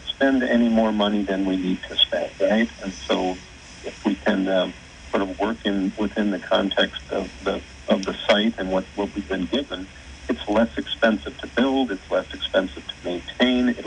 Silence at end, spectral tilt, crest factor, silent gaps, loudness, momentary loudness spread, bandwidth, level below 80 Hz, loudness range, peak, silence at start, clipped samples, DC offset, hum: 0 s; -5 dB/octave; 18 dB; none; -23 LUFS; 11 LU; 9.6 kHz; -46 dBFS; 3 LU; -4 dBFS; 0 s; under 0.1%; under 0.1%; none